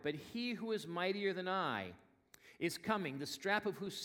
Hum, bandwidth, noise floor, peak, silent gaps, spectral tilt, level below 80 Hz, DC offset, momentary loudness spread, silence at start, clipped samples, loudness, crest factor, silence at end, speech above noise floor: none; 17.5 kHz; -65 dBFS; -20 dBFS; none; -4.5 dB/octave; -80 dBFS; under 0.1%; 5 LU; 0 s; under 0.1%; -39 LUFS; 20 dB; 0 s; 25 dB